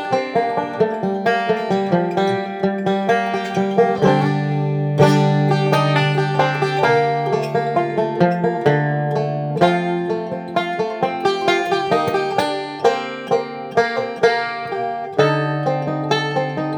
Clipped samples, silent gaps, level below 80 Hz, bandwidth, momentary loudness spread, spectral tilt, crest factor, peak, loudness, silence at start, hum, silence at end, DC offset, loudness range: under 0.1%; none; -60 dBFS; 14.5 kHz; 6 LU; -6.5 dB/octave; 18 dB; 0 dBFS; -19 LUFS; 0 s; none; 0 s; under 0.1%; 3 LU